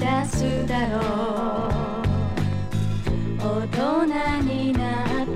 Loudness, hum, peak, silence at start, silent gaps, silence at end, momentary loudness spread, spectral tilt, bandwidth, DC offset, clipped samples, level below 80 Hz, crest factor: -24 LUFS; none; -8 dBFS; 0 s; none; 0 s; 4 LU; -6.5 dB/octave; 14.5 kHz; under 0.1%; under 0.1%; -34 dBFS; 14 dB